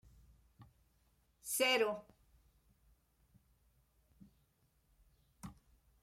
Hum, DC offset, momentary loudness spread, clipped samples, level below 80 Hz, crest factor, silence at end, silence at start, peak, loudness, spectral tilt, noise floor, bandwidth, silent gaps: none; under 0.1%; 24 LU; under 0.1%; -72 dBFS; 24 dB; 0.5 s; 0.6 s; -20 dBFS; -35 LUFS; -1.5 dB/octave; -76 dBFS; 16.5 kHz; none